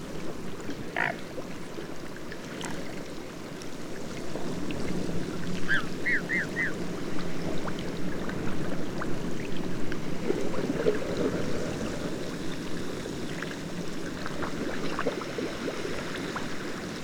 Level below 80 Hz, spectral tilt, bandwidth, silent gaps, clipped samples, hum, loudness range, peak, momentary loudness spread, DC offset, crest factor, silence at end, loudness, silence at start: -46 dBFS; -5 dB/octave; 18.5 kHz; none; under 0.1%; none; 5 LU; -8 dBFS; 10 LU; under 0.1%; 20 dB; 0 s; -33 LUFS; 0 s